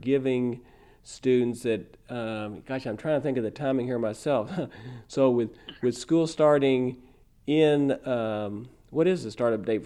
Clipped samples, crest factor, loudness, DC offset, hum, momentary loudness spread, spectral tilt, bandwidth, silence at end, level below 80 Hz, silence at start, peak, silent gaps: under 0.1%; 18 dB; -27 LUFS; under 0.1%; none; 13 LU; -6.5 dB/octave; 12 kHz; 0 s; -60 dBFS; 0 s; -10 dBFS; none